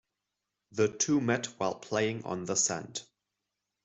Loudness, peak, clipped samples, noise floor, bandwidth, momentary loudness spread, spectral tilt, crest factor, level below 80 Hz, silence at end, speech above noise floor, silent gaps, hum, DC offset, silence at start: -30 LUFS; -14 dBFS; under 0.1%; -86 dBFS; 8.2 kHz; 12 LU; -3.5 dB/octave; 20 dB; -72 dBFS; 0.8 s; 55 dB; none; none; under 0.1%; 0.7 s